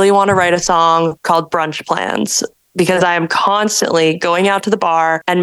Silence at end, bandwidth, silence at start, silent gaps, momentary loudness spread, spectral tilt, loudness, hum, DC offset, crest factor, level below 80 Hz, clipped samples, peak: 0 s; 13 kHz; 0 s; none; 6 LU; -3.5 dB/octave; -14 LUFS; none; under 0.1%; 14 dB; -50 dBFS; under 0.1%; 0 dBFS